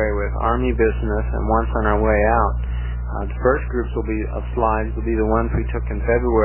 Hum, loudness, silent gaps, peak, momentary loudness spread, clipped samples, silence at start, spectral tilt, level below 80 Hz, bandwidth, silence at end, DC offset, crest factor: 60 Hz at -25 dBFS; -21 LUFS; none; -2 dBFS; 8 LU; under 0.1%; 0 s; -12 dB/octave; -24 dBFS; 3.2 kHz; 0 s; 0.1%; 16 dB